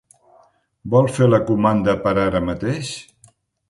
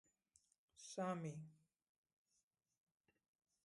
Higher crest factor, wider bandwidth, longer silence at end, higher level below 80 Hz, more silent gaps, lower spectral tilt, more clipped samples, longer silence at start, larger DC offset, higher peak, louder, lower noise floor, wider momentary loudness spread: about the same, 18 dB vs 22 dB; about the same, 11.5 kHz vs 11.5 kHz; second, 0.7 s vs 2.1 s; first, -44 dBFS vs under -90 dBFS; neither; first, -7 dB/octave vs -5.5 dB/octave; neither; about the same, 0.85 s vs 0.75 s; neither; first, -2 dBFS vs -32 dBFS; first, -18 LUFS vs -49 LUFS; second, -55 dBFS vs -88 dBFS; second, 13 LU vs 16 LU